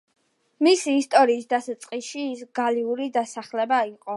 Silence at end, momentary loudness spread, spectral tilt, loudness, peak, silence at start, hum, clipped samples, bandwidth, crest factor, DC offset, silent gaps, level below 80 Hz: 0 s; 12 LU; -2.5 dB/octave; -23 LUFS; -4 dBFS; 0.6 s; none; under 0.1%; 11.5 kHz; 20 dB; under 0.1%; none; -82 dBFS